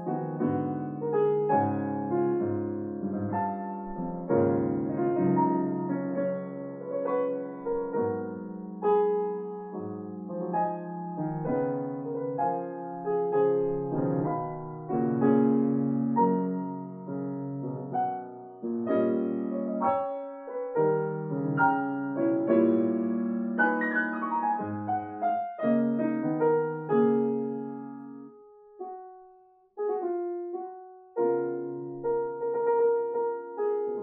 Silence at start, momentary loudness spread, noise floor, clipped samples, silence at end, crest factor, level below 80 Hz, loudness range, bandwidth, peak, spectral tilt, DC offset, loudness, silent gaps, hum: 0 s; 12 LU; -58 dBFS; under 0.1%; 0 s; 18 dB; -64 dBFS; 5 LU; 3.6 kHz; -12 dBFS; -8.5 dB/octave; under 0.1%; -29 LUFS; none; none